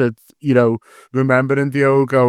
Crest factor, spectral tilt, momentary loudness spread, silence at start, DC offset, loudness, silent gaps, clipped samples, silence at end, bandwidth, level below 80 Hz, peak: 16 dB; -8.5 dB/octave; 10 LU; 0 s; under 0.1%; -16 LUFS; none; under 0.1%; 0 s; 13 kHz; -62 dBFS; 0 dBFS